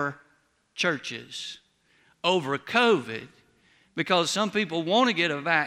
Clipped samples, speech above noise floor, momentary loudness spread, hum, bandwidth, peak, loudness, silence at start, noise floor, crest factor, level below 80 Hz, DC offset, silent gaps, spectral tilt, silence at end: under 0.1%; 41 dB; 16 LU; none; 15.5 kHz; -6 dBFS; -25 LUFS; 0 s; -66 dBFS; 20 dB; -74 dBFS; under 0.1%; none; -3.5 dB/octave; 0 s